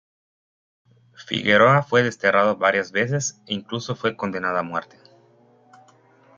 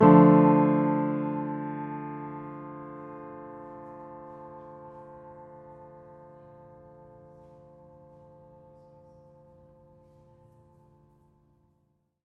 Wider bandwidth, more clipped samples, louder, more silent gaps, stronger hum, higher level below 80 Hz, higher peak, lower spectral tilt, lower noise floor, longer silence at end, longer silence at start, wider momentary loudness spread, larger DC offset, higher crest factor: first, 7.6 kHz vs 3.6 kHz; neither; first, -21 LUFS vs -24 LUFS; neither; neither; about the same, -64 dBFS vs -68 dBFS; about the same, -4 dBFS vs -4 dBFS; second, -4.5 dB/octave vs -12 dB/octave; second, -56 dBFS vs -72 dBFS; second, 1.55 s vs 7.25 s; first, 1.2 s vs 0 s; second, 13 LU vs 29 LU; neither; about the same, 20 dB vs 24 dB